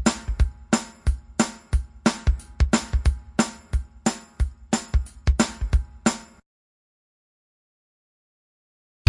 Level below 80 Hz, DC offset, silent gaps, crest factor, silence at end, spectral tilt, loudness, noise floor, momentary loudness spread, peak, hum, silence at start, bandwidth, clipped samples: -28 dBFS; under 0.1%; none; 22 dB; 2.85 s; -5 dB/octave; -26 LUFS; under -90 dBFS; 6 LU; -4 dBFS; none; 0 s; 11.5 kHz; under 0.1%